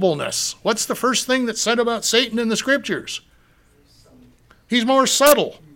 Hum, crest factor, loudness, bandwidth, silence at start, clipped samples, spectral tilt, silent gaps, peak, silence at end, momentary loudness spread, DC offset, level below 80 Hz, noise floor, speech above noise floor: none; 20 dB; -18 LUFS; 17 kHz; 0 s; under 0.1%; -2.5 dB/octave; none; 0 dBFS; 0.2 s; 8 LU; under 0.1%; -58 dBFS; -55 dBFS; 36 dB